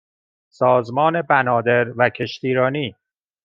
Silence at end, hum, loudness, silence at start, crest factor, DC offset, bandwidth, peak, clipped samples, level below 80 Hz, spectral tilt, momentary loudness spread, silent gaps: 0.5 s; none; -19 LUFS; 0.6 s; 18 dB; under 0.1%; 7.2 kHz; -2 dBFS; under 0.1%; -66 dBFS; -7 dB/octave; 7 LU; none